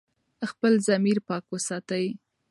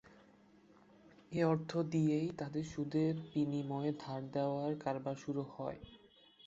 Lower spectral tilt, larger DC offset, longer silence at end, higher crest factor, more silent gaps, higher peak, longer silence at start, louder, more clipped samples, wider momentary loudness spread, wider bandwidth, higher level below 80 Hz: second, -5 dB/octave vs -7.5 dB/octave; neither; first, 0.35 s vs 0 s; about the same, 16 dB vs 18 dB; neither; first, -10 dBFS vs -20 dBFS; first, 0.4 s vs 0.1 s; first, -26 LUFS vs -38 LUFS; neither; first, 14 LU vs 10 LU; first, 11.5 kHz vs 7.8 kHz; second, -76 dBFS vs -70 dBFS